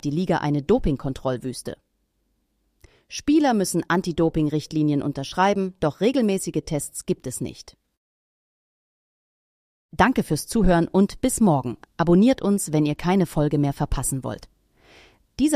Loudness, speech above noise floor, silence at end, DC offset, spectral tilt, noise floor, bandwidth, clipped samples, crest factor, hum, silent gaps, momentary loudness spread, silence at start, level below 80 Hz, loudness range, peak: -22 LUFS; 49 dB; 0 s; under 0.1%; -6 dB/octave; -71 dBFS; 15.5 kHz; under 0.1%; 18 dB; none; 7.97-9.89 s; 12 LU; 0.05 s; -40 dBFS; 8 LU; -4 dBFS